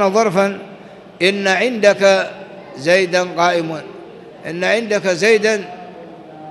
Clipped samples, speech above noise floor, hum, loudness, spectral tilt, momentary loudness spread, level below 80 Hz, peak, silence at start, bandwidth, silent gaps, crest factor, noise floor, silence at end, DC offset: under 0.1%; 22 dB; none; -15 LUFS; -4 dB/octave; 22 LU; -64 dBFS; -2 dBFS; 0 s; 12 kHz; none; 16 dB; -37 dBFS; 0 s; under 0.1%